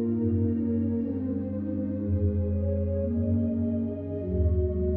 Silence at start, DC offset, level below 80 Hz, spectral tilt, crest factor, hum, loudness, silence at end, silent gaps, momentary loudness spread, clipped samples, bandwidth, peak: 0 s; under 0.1%; -36 dBFS; -14 dB/octave; 12 dB; none; -28 LUFS; 0 s; none; 5 LU; under 0.1%; 2.6 kHz; -14 dBFS